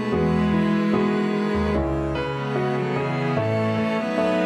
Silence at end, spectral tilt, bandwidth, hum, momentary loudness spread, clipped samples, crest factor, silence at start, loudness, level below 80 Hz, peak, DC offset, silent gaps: 0 s; -7.5 dB/octave; 10.5 kHz; none; 4 LU; under 0.1%; 14 dB; 0 s; -23 LUFS; -38 dBFS; -8 dBFS; under 0.1%; none